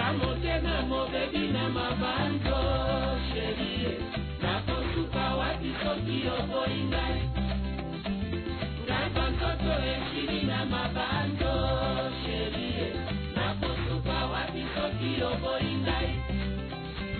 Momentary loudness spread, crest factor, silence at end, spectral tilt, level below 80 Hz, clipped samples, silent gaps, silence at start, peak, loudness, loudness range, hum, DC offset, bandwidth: 4 LU; 16 dB; 0 s; -9 dB/octave; -38 dBFS; under 0.1%; none; 0 s; -14 dBFS; -30 LUFS; 2 LU; none; under 0.1%; 4.6 kHz